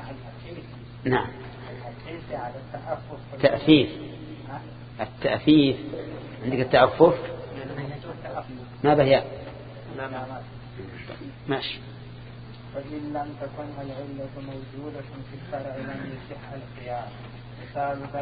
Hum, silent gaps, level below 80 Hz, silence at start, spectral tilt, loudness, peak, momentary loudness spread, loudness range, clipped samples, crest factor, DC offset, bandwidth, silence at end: none; none; -52 dBFS; 0 s; -10.5 dB/octave; -26 LUFS; -2 dBFS; 21 LU; 13 LU; under 0.1%; 24 dB; under 0.1%; 5 kHz; 0 s